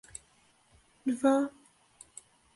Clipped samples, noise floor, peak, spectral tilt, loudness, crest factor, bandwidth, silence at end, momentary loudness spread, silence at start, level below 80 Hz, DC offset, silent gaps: under 0.1%; -66 dBFS; -14 dBFS; -4.5 dB/octave; -30 LUFS; 20 dB; 11.5 kHz; 1.05 s; 23 LU; 1.05 s; -72 dBFS; under 0.1%; none